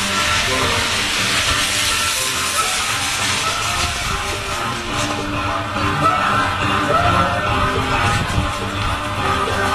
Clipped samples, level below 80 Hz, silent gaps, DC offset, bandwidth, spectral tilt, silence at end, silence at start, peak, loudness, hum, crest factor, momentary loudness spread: under 0.1%; -32 dBFS; none; under 0.1%; 14 kHz; -2.5 dB/octave; 0 s; 0 s; -4 dBFS; -17 LUFS; none; 14 dB; 6 LU